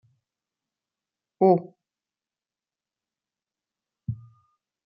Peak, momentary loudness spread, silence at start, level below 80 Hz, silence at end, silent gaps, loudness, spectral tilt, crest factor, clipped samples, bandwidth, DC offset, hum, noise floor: -6 dBFS; 19 LU; 1.4 s; -68 dBFS; 0.7 s; none; -22 LUFS; -10.5 dB/octave; 24 dB; under 0.1%; 5.4 kHz; under 0.1%; none; under -90 dBFS